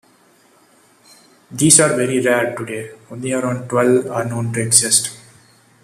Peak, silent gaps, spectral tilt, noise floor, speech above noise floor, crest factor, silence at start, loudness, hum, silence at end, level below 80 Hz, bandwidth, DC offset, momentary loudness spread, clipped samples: 0 dBFS; none; -3.5 dB/octave; -53 dBFS; 36 dB; 18 dB; 1.5 s; -15 LUFS; none; 0.65 s; -58 dBFS; 15 kHz; under 0.1%; 17 LU; under 0.1%